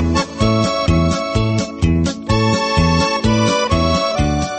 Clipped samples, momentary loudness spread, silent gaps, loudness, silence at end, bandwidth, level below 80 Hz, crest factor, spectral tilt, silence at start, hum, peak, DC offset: under 0.1%; 3 LU; none; -16 LUFS; 0 s; 8.8 kHz; -26 dBFS; 14 dB; -5.5 dB/octave; 0 s; none; -2 dBFS; under 0.1%